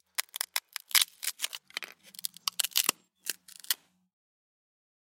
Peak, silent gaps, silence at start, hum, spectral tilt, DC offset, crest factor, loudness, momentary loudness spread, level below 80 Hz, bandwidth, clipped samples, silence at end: -2 dBFS; none; 0.2 s; none; 3 dB/octave; under 0.1%; 32 dB; -31 LUFS; 14 LU; -86 dBFS; 17 kHz; under 0.1%; 1.3 s